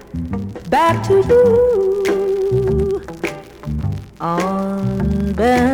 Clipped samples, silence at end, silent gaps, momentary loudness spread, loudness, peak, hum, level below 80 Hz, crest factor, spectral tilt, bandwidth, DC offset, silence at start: under 0.1%; 0 s; none; 13 LU; -17 LUFS; -4 dBFS; none; -34 dBFS; 14 dB; -7 dB/octave; 17 kHz; under 0.1%; 0 s